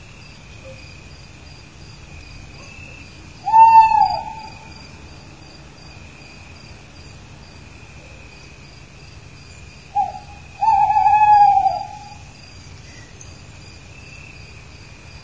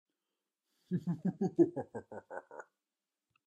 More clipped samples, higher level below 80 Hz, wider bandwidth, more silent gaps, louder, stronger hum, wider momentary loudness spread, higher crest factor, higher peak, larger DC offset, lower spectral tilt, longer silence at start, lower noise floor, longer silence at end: neither; first, -46 dBFS vs -84 dBFS; about the same, 8 kHz vs 8.2 kHz; neither; first, -14 LUFS vs -35 LUFS; neither; first, 29 LU vs 18 LU; about the same, 20 dB vs 22 dB; first, 0 dBFS vs -16 dBFS; first, 0.3% vs under 0.1%; second, -4 dB/octave vs -10 dB/octave; second, 0.65 s vs 0.9 s; second, -41 dBFS vs under -90 dBFS; first, 3.2 s vs 0.85 s